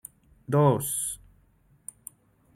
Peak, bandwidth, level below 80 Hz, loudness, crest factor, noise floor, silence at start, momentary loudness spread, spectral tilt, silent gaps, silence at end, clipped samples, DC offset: -10 dBFS; 16.5 kHz; -60 dBFS; -25 LUFS; 20 dB; -62 dBFS; 0.5 s; 24 LU; -6 dB/octave; none; 1.4 s; under 0.1%; under 0.1%